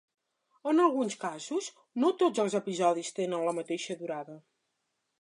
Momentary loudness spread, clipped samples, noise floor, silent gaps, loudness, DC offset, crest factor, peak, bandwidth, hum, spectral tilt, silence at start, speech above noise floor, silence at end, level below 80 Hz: 13 LU; under 0.1%; -81 dBFS; none; -31 LUFS; under 0.1%; 20 dB; -12 dBFS; 11.5 kHz; none; -4.5 dB/octave; 0.65 s; 51 dB; 0.8 s; -86 dBFS